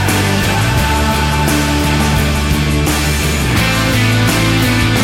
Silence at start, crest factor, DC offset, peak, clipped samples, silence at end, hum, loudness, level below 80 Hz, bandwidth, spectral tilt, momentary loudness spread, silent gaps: 0 s; 10 dB; under 0.1%; -2 dBFS; under 0.1%; 0 s; none; -13 LUFS; -20 dBFS; 16.5 kHz; -4.5 dB/octave; 2 LU; none